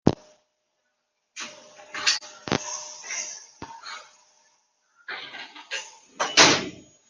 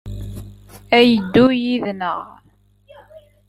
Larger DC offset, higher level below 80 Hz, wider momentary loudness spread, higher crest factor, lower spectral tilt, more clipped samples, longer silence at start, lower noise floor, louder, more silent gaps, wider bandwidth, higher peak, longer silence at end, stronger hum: neither; second, -58 dBFS vs -42 dBFS; first, 25 LU vs 21 LU; first, 28 dB vs 18 dB; second, -2 dB/octave vs -6.5 dB/octave; neither; about the same, 0.05 s vs 0.05 s; first, -76 dBFS vs -55 dBFS; second, -23 LUFS vs -16 LUFS; neither; second, 10 kHz vs 13 kHz; about the same, -2 dBFS vs 0 dBFS; about the same, 0.3 s vs 0.3 s; second, none vs 50 Hz at -45 dBFS